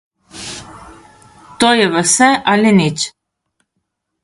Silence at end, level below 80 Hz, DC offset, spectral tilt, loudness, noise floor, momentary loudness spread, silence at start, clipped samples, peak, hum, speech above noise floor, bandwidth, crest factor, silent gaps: 1.15 s; -52 dBFS; under 0.1%; -3.5 dB/octave; -12 LUFS; -72 dBFS; 18 LU; 0.35 s; under 0.1%; 0 dBFS; none; 60 dB; 11.5 kHz; 16 dB; none